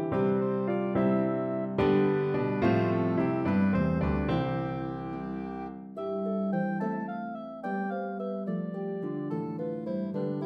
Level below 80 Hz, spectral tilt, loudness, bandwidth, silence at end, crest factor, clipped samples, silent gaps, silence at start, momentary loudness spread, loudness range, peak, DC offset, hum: -50 dBFS; -10 dB/octave; -30 LUFS; 5.8 kHz; 0 s; 16 dB; under 0.1%; none; 0 s; 10 LU; 7 LU; -14 dBFS; under 0.1%; none